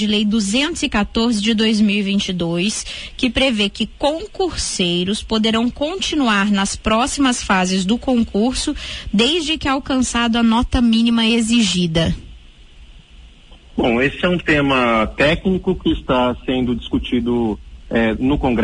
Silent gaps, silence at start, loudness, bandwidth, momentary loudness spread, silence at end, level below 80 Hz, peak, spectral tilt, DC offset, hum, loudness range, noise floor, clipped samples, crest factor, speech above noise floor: none; 0 s; -17 LUFS; 11 kHz; 6 LU; 0 s; -34 dBFS; -2 dBFS; -4.5 dB/octave; under 0.1%; none; 3 LU; -42 dBFS; under 0.1%; 16 dB; 25 dB